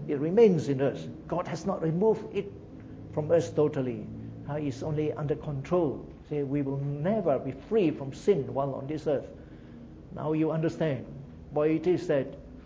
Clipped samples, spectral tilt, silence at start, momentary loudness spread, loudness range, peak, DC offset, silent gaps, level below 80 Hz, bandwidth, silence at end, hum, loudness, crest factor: under 0.1%; -8 dB/octave; 0 s; 16 LU; 2 LU; -10 dBFS; under 0.1%; none; -54 dBFS; 8 kHz; 0 s; none; -29 LUFS; 18 dB